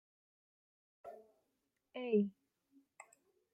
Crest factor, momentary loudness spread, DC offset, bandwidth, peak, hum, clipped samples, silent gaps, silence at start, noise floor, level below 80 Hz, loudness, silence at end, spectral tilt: 22 dB; 25 LU; under 0.1%; 8.8 kHz; -22 dBFS; none; under 0.1%; none; 1.05 s; -85 dBFS; -88 dBFS; -38 LUFS; 0.5 s; -7.5 dB/octave